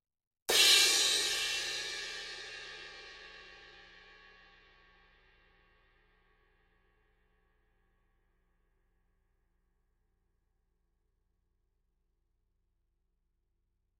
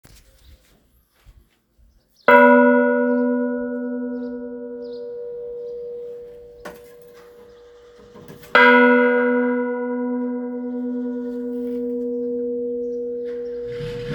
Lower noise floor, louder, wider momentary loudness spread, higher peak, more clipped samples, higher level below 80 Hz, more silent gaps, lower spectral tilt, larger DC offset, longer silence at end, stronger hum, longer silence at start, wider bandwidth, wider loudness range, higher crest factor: first, -80 dBFS vs -59 dBFS; second, -27 LUFS vs -19 LUFS; first, 27 LU vs 20 LU; second, -12 dBFS vs 0 dBFS; neither; second, -70 dBFS vs -56 dBFS; neither; second, 2 dB/octave vs -6.5 dB/octave; neither; first, 10.45 s vs 0 s; neither; about the same, 0.5 s vs 0.5 s; second, 15 kHz vs 18.5 kHz; first, 25 LU vs 16 LU; first, 28 dB vs 22 dB